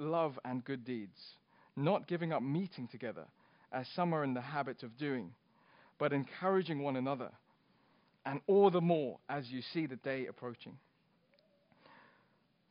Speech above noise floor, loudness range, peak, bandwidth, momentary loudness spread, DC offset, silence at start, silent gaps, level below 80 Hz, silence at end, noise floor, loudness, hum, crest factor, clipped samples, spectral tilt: 37 dB; 6 LU; -16 dBFS; 5.2 kHz; 15 LU; under 0.1%; 0 s; none; -86 dBFS; 1.95 s; -74 dBFS; -37 LUFS; none; 22 dB; under 0.1%; -6 dB/octave